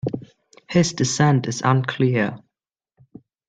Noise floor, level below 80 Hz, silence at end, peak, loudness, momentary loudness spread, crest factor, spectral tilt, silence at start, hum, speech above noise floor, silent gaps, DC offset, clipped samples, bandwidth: -84 dBFS; -58 dBFS; 1.1 s; -4 dBFS; -20 LUFS; 8 LU; 18 dB; -5.5 dB/octave; 0.05 s; none; 65 dB; none; under 0.1%; under 0.1%; 9.4 kHz